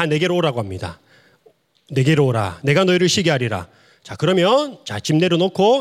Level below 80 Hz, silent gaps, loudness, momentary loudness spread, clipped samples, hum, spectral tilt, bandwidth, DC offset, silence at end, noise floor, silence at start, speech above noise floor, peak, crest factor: -60 dBFS; none; -18 LUFS; 12 LU; under 0.1%; none; -5.5 dB/octave; 15 kHz; under 0.1%; 0 s; -56 dBFS; 0 s; 39 dB; -2 dBFS; 16 dB